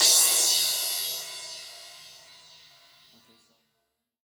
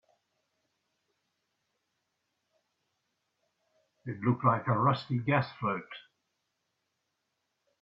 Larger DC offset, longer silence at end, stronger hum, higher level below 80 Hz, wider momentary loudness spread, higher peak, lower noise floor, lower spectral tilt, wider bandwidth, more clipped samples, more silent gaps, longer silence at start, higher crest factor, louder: neither; first, 2.25 s vs 1.8 s; neither; second, -78 dBFS vs -72 dBFS; first, 26 LU vs 19 LU; first, -6 dBFS vs -12 dBFS; about the same, -79 dBFS vs -82 dBFS; second, 3 dB/octave vs -9 dB/octave; first, over 20 kHz vs 5.6 kHz; neither; neither; second, 0 s vs 4.05 s; about the same, 22 dB vs 24 dB; first, -22 LUFS vs -30 LUFS